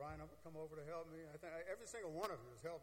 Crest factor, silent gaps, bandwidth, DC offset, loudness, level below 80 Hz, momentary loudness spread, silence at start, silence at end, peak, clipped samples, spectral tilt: 24 dB; none; 16.5 kHz; under 0.1%; -51 LUFS; -70 dBFS; 8 LU; 0 s; 0 s; -28 dBFS; under 0.1%; -5 dB/octave